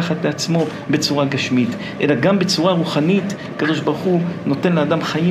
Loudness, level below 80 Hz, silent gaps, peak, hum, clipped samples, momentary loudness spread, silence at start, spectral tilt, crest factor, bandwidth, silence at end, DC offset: -18 LUFS; -60 dBFS; none; -2 dBFS; none; under 0.1%; 5 LU; 0 s; -5.5 dB/octave; 14 dB; 14 kHz; 0 s; under 0.1%